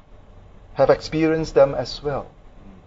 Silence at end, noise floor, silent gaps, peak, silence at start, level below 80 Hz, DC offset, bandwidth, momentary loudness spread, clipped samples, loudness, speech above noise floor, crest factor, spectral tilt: 0.15 s; -45 dBFS; none; -2 dBFS; 0.1 s; -42 dBFS; under 0.1%; 7.8 kHz; 11 LU; under 0.1%; -20 LUFS; 26 dB; 20 dB; -6.5 dB/octave